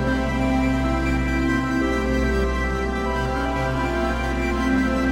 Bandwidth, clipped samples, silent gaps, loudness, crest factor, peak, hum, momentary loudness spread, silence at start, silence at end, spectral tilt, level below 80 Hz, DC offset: 13.5 kHz; under 0.1%; none; -22 LUFS; 12 dB; -10 dBFS; none; 3 LU; 0 s; 0 s; -6.5 dB/octave; -28 dBFS; under 0.1%